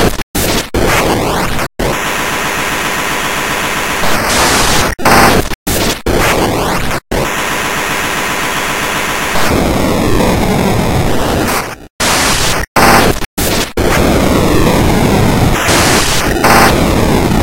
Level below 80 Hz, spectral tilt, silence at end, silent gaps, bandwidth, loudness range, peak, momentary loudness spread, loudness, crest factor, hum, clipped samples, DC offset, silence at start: -22 dBFS; -4 dB/octave; 0 s; 0.23-0.34 s, 5.55-5.66 s, 11.90-11.99 s, 12.67-12.75 s, 13.26-13.37 s; over 20 kHz; 4 LU; 0 dBFS; 6 LU; -11 LUFS; 12 dB; none; 0.3%; 3%; 0 s